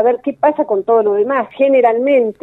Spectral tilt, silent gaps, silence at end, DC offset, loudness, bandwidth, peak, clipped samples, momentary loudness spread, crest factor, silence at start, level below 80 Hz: -8 dB/octave; none; 0.1 s; under 0.1%; -14 LUFS; 4 kHz; 0 dBFS; under 0.1%; 4 LU; 12 dB; 0 s; -64 dBFS